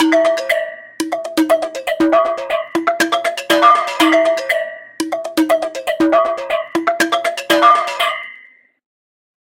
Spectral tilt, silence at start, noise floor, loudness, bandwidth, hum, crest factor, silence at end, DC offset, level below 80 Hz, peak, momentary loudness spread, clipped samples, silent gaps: -2.5 dB/octave; 0 s; -44 dBFS; -15 LUFS; 17 kHz; none; 16 dB; 1.15 s; under 0.1%; -58 dBFS; 0 dBFS; 11 LU; under 0.1%; none